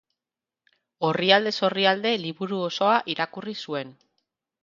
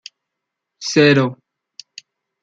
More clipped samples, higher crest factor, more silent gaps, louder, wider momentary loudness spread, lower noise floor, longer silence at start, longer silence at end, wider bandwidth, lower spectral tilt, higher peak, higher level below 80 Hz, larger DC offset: neither; first, 24 dB vs 18 dB; neither; second, -24 LUFS vs -15 LUFS; second, 13 LU vs 25 LU; first, -90 dBFS vs -80 dBFS; first, 1 s vs 0.8 s; second, 0.7 s vs 1.1 s; second, 7.6 kHz vs 8.8 kHz; about the same, -5 dB/octave vs -5 dB/octave; about the same, -2 dBFS vs -2 dBFS; second, -76 dBFS vs -64 dBFS; neither